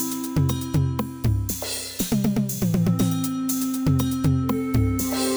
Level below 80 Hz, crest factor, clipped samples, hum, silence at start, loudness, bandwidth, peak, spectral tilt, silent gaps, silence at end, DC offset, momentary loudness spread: -38 dBFS; 14 dB; under 0.1%; none; 0 s; -23 LUFS; over 20 kHz; -8 dBFS; -5.5 dB/octave; none; 0 s; under 0.1%; 4 LU